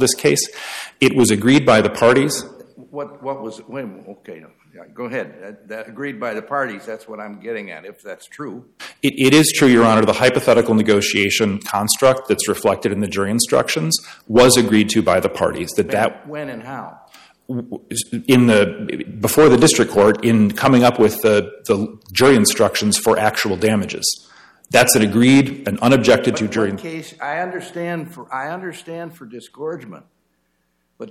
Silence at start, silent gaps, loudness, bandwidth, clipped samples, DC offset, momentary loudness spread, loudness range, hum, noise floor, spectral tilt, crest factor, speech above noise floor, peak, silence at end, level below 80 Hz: 0 s; none; -16 LUFS; 16 kHz; under 0.1%; under 0.1%; 20 LU; 14 LU; none; -67 dBFS; -4 dB/octave; 16 dB; 50 dB; 0 dBFS; 0 s; -52 dBFS